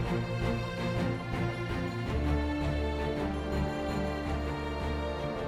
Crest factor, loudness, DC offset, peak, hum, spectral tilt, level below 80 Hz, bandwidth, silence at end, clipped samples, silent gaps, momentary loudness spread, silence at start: 14 dB; -33 LUFS; under 0.1%; -18 dBFS; none; -7 dB/octave; -38 dBFS; 15 kHz; 0 s; under 0.1%; none; 3 LU; 0 s